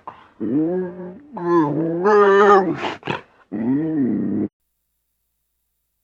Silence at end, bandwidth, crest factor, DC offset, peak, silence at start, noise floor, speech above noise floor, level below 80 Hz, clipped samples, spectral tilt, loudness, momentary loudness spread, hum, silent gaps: 1.55 s; 7.4 kHz; 18 dB; under 0.1%; -2 dBFS; 0.05 s; -72 dBFS; 53 dB; -62 dBFS; under 0.1%; -7.5 dB/octave; -19 LUFS; 17 LU; none; none